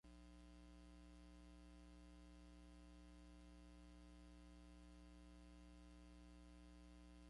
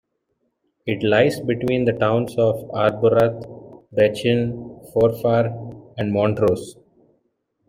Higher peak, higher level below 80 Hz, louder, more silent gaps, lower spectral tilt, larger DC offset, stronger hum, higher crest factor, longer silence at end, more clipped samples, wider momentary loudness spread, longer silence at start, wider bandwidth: second, -54 dBFS vs -4 dBFS; second, -66 dBFS vs -54 dBFS; second, -65 LUFS vs -20 LUFS; neither; second, -5.5 dB/octave vs -7 dB/octave; neither; first, 60 Hz at -65 dBFS vs none; second, 10 dB vs 16 dB; second, 0 s vs 0.95 s; neither; second, 0 LU vs 16 LU; second, 0.05 s vs 0.85 s; second, 11 kHz vs 16 kHz